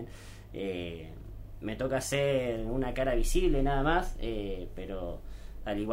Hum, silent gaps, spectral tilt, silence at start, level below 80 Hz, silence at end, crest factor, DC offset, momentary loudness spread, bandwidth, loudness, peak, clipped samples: none; none; -5.5 dB/octave; 0 s; -36 dBFS; 0 s; 16 dB; under 0.1%; 17 LU; 16 kHz; -33 LUFS; -14 dBFS; under 0.1%